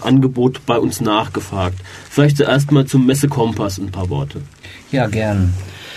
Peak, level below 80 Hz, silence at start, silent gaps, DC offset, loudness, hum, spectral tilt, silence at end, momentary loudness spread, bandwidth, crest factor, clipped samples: 0 dBFS; -44 dBFS; 0 s; none; under 0.1%; -16 LUFS; none; -6.5 dB/octave; 0 s; 12 LU; 13.5 kHz; 16 dB; under 0.1%